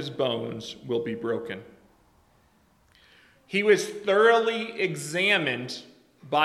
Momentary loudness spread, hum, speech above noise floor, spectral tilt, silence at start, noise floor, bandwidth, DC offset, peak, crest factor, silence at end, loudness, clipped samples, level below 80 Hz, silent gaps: 16 LU; none; 37 dB; -4 dB/octave; 0 s; -63 dBFS; 13.5 kHz; under 0.1%; -6 dBFS; 22 dB; 0 s; -25 LUFS; under 0.1%; -70 dBFS; none